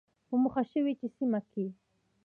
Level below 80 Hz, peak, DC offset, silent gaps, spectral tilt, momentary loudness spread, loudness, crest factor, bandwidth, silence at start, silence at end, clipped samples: -72 dBFS; -18 dBFS; under 0.1%; none; -10 dB/octave; 9 LU; -33 LUFS; 14 dB; 4 kHz; 0.3 s; 0.5 s; under 0.1%